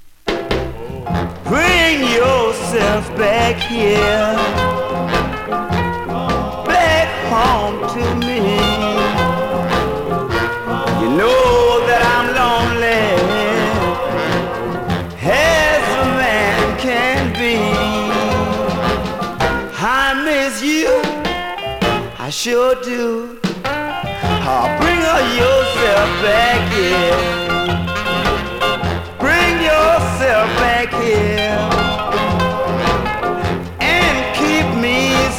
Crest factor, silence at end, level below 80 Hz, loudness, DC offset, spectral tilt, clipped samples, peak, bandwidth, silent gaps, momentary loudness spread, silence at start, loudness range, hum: 14 dB; 0 s; -32 dBFS; -15 LUFS; under 0.1%; -4.5 dB/octave; under 0.1%; -2 dBFS; 17.5 kHz; none; 8 LU; 0 s; 3 LU; none